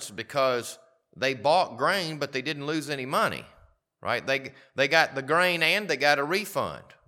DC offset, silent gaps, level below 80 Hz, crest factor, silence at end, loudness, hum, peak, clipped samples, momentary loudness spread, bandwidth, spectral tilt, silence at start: under 0.1%; none; -68 dBFS; 22 dB; 0.25 s; -26 LUFS; none; -4 dBFS; under 0.1%; 10 LU; 18 kHz; -3.5 dB/octave; 0 s